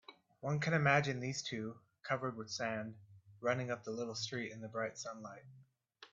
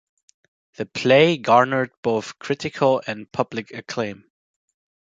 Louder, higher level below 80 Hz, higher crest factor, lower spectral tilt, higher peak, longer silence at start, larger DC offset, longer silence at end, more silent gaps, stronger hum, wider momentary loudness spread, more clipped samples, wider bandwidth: second, -38 LUFS vs -21 LUFS; second, -76 dBFS vs -64 dBFS; about the same, 24 dB vs 20 dB; about the same, -5 dB/octave vs -5.5 dB/octave; second, -16 dBFS vs -2 dBFS; second, 0.1 s vs 0.8 s; neither; second, 0.05 s vs 0.95 s; second, none vs 1.97-2.03 s; neither; about the same, 16 LU vs 15 LU; neither; about the same, 8 kHz vs 7.8 kHz